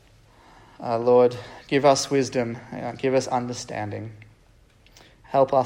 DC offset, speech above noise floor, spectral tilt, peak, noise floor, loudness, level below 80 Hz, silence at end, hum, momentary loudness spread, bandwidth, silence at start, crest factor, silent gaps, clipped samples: under 0.1%; 34 dB; -5 dB/octave; -4 dBFS; -56 dBFS; -23 LUFS; -58 dBFS; 0 s; none; 15 LU; 16 kHz; 0.8 s; 20 dB; none; under 0.1%